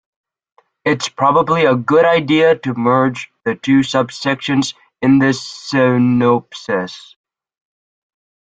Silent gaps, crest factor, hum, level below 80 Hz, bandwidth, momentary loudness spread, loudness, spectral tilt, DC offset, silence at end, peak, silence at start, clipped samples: none; 14 dB; none; -56 dBFS; 9.2 kHz; 9 LU; -15 LUFS; -6 dB/octave; under 0.1%; 1.5 s; -2 dBFS; 0.85 s; under 0.1%